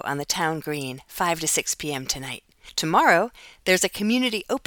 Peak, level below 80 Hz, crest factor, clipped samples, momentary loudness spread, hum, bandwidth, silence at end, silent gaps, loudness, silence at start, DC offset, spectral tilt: -4 dBFS; -54 dBFS; 22 dB; under 0.1%; 12 LU; none; 19 kHz; 0.1 s; none; -23 LUFS; 0.05 s; under 0.1%; -2.5 dB/octave